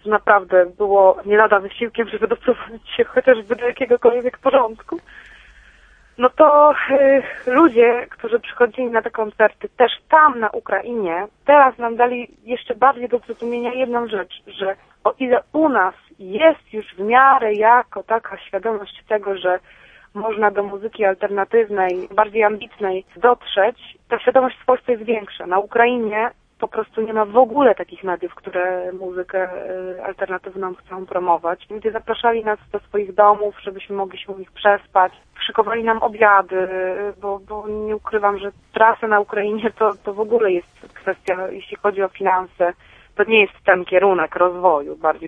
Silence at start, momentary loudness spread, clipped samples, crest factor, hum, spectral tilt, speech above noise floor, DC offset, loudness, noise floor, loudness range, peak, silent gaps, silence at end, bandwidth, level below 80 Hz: 0.05 s; 13 LU; under 0.1%; 18 dB; none; -6.5 dB/octave; 32 dB; under 0.1%; -18 LUFS; -50 dBFS; 5 LU; 0 dBFS; none; 0 s; 3.9 kHz; -56 dBFS